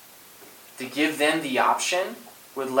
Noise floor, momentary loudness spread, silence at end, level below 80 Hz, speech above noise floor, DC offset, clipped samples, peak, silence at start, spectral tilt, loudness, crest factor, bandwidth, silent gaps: -48 dBFS; 23 LU; 0 s; -80 dBFS; 24 dB; under 0.1%; under 0.1%; -8 dBFS; 0.05 s; -2.5 dB/octave; -24 LUFS; 18 dB; 17.5 kHz; none